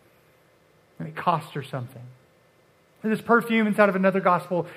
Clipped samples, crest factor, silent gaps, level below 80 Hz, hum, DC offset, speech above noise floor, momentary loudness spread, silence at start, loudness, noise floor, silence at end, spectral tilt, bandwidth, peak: under 0.1%; 22 dB; none; -76 dBFS; none; under 0.1%; 37 dB; 16 LU; 1 s; -23 LUFS; -60 dBFS; 0 s; -7 dB/octave; 15.5 kHz; -2 dBFS